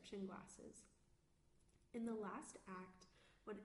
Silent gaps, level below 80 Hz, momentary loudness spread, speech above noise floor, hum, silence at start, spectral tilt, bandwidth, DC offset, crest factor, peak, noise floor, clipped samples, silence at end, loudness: none; -78 dBFS; 17 LU; 25 dB; none; 0 s; -5.5 dB/octave; 11.5 kHz; under 0.1%; 18 dB; -38 dBFS; -77 dBFS; under 0.1%; 0 s; -53 LUFS